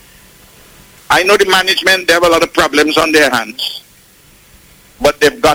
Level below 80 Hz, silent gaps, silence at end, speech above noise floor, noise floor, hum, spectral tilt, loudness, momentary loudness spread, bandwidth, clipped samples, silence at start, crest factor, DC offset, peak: -40 dBFS; none; 0 s; 33 dB; -44 dBFS; none; -2.5 dB/octave; -11 LUFS; 9 LU; 17 kHz; under 0.1%; 1.1 s; 14 dB; under 0.1%; 0 dBFS